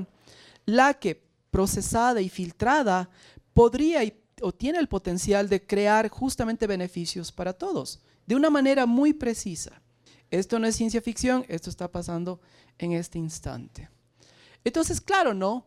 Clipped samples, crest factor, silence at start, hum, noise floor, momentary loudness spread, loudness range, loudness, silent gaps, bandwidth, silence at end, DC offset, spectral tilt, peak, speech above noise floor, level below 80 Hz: under 0.1%; 20 dB; 0 s; none; -58 dBFS; 15 LU; 6 LU; -26 LUFS; none; 15.5 kHz; 0.05 s; under 0.1%; -5 dB/octave; -6 dBFS; 33 dB; -46 dBFS